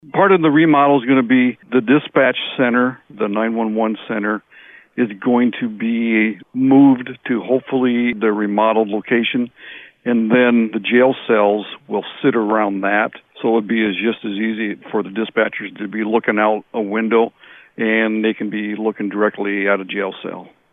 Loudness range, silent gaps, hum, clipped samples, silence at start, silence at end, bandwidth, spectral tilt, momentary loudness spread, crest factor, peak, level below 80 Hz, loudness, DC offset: 4 LU; none; none; under 0.1%; 0.15 s; 0.25 s; 3.9 kHz; -9.5 dB/octave; 10 LU; 14 dB; -4 dBFS; -66 dBFS; -17 LUFS; under 0.1%